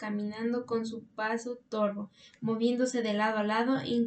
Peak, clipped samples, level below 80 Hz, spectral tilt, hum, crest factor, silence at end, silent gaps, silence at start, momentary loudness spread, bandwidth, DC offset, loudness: -16 dBFS; under 0.1%; -76 dBFS; -5 dB/octave; none; 16 dB; 0 s; none; 0 s; 9 LU; 9 kHz; under 0.1%; -31 LUFS